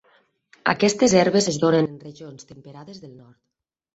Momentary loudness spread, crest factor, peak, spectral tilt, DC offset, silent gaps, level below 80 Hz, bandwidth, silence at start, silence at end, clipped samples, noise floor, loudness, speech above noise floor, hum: 24 LU; 20 dB; -2 dBFS; -4.5 dB/octave; under 0.1%; none; -60 dBFS; 8.2 kHz; 0.65 s; 0.85 s; under 0.1%; -61 dBFS; -19 LUFS; 40 dB; none